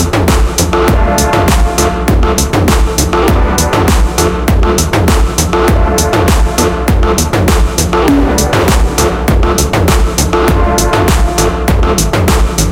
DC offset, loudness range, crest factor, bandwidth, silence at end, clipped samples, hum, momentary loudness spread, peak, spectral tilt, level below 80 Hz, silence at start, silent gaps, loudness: under 0.1%; 0 LU; 10 dB; 17.5 kHz; 0 s; under 0.1%; none; 2 LU; 0 dBFS; -5 dB/octave; -14 dBFS; 0 s; none; -10 LUFS